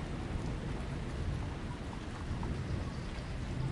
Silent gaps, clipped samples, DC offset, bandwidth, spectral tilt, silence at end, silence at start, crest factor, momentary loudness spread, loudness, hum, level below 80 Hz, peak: none; under 0.1%; under 0.1%; 11.5 kHz; -6.5 dB/octave; 0 s; 0 s; 14 dB; 3 LU; -40 LUFS; none; -44 dBFS; -24 dBFS